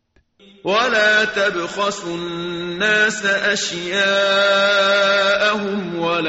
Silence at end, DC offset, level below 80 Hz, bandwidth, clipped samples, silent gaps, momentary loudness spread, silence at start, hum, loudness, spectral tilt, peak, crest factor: 0 s; under 0.1%; -58 dBFS; 8 kHz; under 0.1%; none; 11 LU; 0.65 s; none; -17 LUFS; -0.5 dB/octave; -4 dBFS; 14 dB